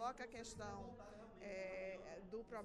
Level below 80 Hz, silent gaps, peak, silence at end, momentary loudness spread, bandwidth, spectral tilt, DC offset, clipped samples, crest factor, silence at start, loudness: -68 dBFS; none; -34 dBFS; 0 s; 8 LU; 12.5 kHz; -4.5 dB/octave; under 0.1%; under 0.1%; 16 dB; 0 s; -52 LUFS